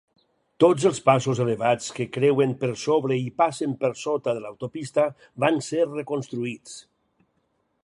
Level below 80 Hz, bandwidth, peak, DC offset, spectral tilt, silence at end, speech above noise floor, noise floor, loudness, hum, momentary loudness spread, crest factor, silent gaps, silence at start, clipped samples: -68 dBFS; 11.5 kHz; -4 dBFS; under 0.1%; -6 dB/octave; 1.05 s; 48 dB; -71 dBFS; -24 LUFS; none; 11 LU; 20 dB; none; 0.6 s; under 0.1%